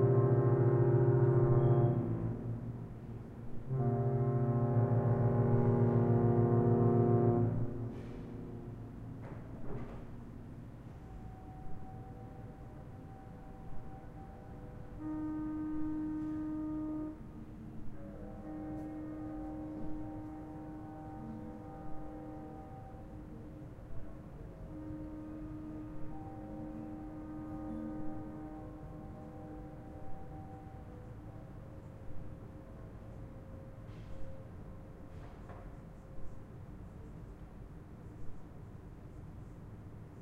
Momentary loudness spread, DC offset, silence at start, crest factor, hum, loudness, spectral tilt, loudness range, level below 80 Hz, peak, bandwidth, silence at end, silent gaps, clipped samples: 22 LU; under 0.1%; 0 s; 20 dB; none; -35 LUFS; -11.5 dB/octave; 20 LU; -52 dBFS; -18 dBFS; 3.4 kHz; 0 s; none; under 0.1%